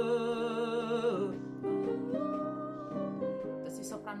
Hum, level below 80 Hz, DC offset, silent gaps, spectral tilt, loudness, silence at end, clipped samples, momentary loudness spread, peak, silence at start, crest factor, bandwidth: none; -72 dBFS; under 0.1%; none; -6 dB/octave; -35 LUFS; 0 s; under 0.1%; 8 LU; -20 dBFS; 0 s; 14 dB; 14 kHz